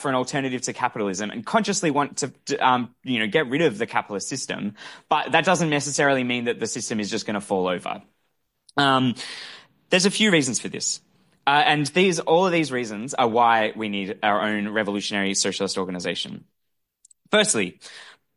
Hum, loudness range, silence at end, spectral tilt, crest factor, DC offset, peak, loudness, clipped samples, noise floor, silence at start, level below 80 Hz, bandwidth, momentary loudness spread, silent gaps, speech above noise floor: none; 4 LU; 0.25 s; -3.5 dB/octave; 20 dB; under 0.1%; -4 dBFS; -22 LUFS; under 0.1%; -78 dBFS; 0 s; -66 dBFS; 11.5 kHz; 10 LU; none; 55 dB